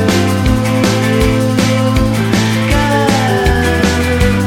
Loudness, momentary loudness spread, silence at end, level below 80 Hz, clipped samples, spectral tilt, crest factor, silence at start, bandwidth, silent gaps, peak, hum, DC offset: -12 LUFS; 1 LU; 0 s; -22 dBFS; under 0.1%; -5.5 dB/octave; 12 dB; 0 s; 17 kHz; none; 0 dBFS; none; under 0.1%